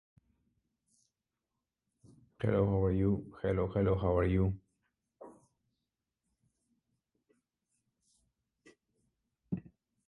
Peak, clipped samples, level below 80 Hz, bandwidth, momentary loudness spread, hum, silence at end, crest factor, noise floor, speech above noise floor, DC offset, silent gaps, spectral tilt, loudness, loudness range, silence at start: -18 dBFS; under 0.1%; -50 dBFS; 4.1 kHz; 13 LU; none; 0.45 s; 20 dB; -89 dBFS; 58 dB; under 0.1%; none; -10 dB/octave; -33 LUFS; 19 LU; 2.4 s